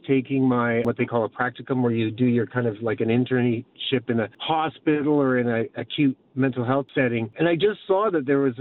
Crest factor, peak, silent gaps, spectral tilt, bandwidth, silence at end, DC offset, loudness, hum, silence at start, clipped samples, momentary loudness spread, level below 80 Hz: 14 dB; -8 dBFS; none; -9.5 dB/octave; 4.2 kHz; 0 s; under 0.1%; -23 LUFS; none; 0.05 s; under 0.1%; 5 LU; -64 dBFS